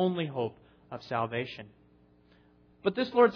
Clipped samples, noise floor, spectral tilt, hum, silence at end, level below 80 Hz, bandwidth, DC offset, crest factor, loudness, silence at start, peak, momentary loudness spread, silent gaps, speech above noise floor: under 0.1%; -62 dBFS; -4.5 dB/octave; none; 0 s; -70 dBFS; 5.4 kHz; under 0.1%; 20 dB; -32 LUFS; 0 s; -10 dBFS; 17 LU; none; 33 dB